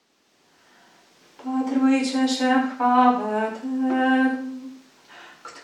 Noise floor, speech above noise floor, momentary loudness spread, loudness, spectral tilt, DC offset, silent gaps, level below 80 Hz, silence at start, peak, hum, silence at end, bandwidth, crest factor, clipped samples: -63 dBFS; 43 dB; 20 LU; -22 LUFS; -3.5 dB/octave; under 0.1%; none; -84 dBFS; 1.4 s; -4 dBFS; none; 0.05 s; 11 kHz; 18 dB; under 0.1%